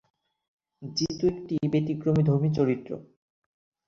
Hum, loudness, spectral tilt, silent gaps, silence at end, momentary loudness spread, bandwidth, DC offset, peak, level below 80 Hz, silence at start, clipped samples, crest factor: none; -26 LUFS; -7 dB/octave; none; 0.85 s; 14 LU; 7 kHz; under 0.1%; -12 dBFS; -58 dBFS; 0.8 s; under 0.1%; 16 dB